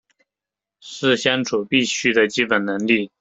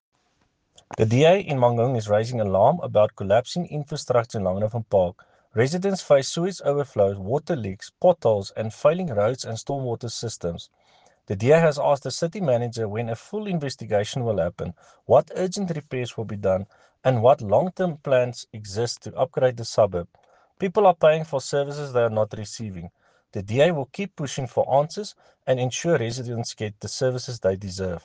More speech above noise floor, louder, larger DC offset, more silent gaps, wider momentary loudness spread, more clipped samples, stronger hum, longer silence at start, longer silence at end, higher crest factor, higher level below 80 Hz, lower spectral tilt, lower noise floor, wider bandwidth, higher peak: first, 68 dB vs 45 dB; first, -19 LUFS vs -23 LUFS; neither; neither; second, 4 LU vs 12 LU; neither; neither; about the same, 0.85 s vs 0.9 s; about the same, 0.15 s vs 0.05 s; about the same, 20 dB vs 18 dB; about the same, -62 dBFS vs -58 dBFS; second, -3.5 dB/octave vs -6 dB/octave; first, -88 dBFS vs -68 dBFS; second, 8.2 kHz vs 9.8 kHz; first, -2 dBFS vs -6 dBFS